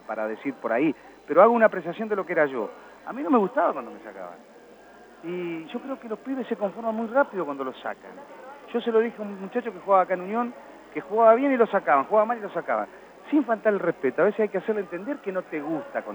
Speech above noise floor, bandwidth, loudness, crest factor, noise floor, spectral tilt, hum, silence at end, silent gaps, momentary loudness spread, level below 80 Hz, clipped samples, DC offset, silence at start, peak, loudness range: 24 dB; 19.5 kHz; -25 LUFS; 22 dB; -49 dBFS; -7.5 dB/octave; none; 0 s; none; 17 LU; -74 dBFS; under 0.1%; under 0.1%; 0.1 s; -4 dBFS; 7 LU